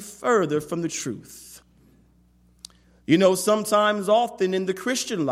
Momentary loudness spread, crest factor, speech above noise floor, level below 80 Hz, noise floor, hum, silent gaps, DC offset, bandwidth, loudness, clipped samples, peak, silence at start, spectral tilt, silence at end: 16 LU; 20 dB; 36 dB; -62 dBFS; -58 dBFS; 60 Hz at -55 dBFS; none; under 0.1%; 16 kHz; -22 LUFS; under 0.1%; -4 dBFS; 0 s; -4.5 dB/octave; 0 s